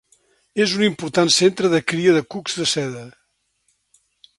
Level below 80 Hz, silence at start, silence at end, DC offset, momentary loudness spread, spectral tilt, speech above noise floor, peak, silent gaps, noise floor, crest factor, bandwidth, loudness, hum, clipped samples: -64 dBFS; 0.55 s; 1.3 s; under 0.1%; 12 LU; -3.5 dB/octave; 50 dB; -2 dBFS; none; -69 dBFS; 18 dB; 11.5 kHz; -19 LUFS; none; under 0.1%